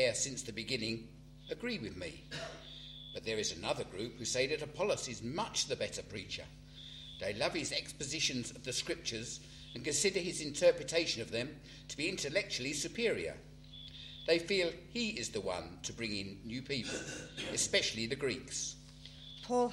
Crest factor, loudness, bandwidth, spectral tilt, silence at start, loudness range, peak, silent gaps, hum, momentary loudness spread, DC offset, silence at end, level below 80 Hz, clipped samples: 22 dB; -37 LUFS; 15 kHz; -2.5 dB/octave; 0 s; 4 LU; -16 dBFS; none; none; 16 LU; under 0.1%; 0 s; -60 dBFS; under 0.1%